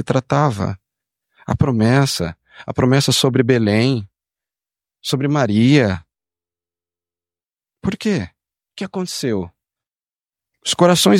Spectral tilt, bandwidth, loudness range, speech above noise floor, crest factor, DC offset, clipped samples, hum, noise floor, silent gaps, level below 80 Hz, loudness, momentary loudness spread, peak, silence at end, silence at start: -5.5 dB/octave; 16.5 kHz; 9 LU; over 74 dB; 18 dB; under 0.1%; under 0.1%; none; under -90 dBFS; none; -48 dBFS; -17 LUFS; 14 LU; -2 dBFS; 0 s; 0 s